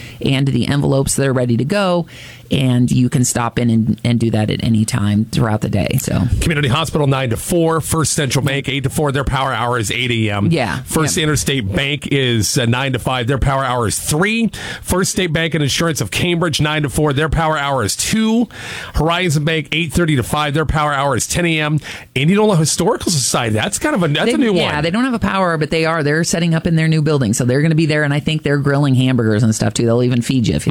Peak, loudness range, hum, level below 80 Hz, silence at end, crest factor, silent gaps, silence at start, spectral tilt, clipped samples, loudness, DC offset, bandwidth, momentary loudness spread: -4 dBFS; 2 LU; none; -34 dBFS; 0 s; 12 dB; none; 0 s; -5 dB/octave; under 0.1%; -16 LUFS; under 0.1%; 17 kHz; 3 LU